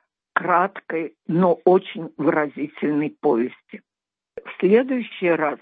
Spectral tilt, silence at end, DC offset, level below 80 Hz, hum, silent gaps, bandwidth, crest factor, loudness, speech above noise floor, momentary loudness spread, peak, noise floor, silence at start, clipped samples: -10.5 dB/octave; 0.05 s; under 0.1%; -74 dBFS; none; none; 4.6 kHz; 20 dB; -21 LUFS; 24 dB; 10 LU; -2 dBFS; -44 dBFS; 0.35 s; under 0.1%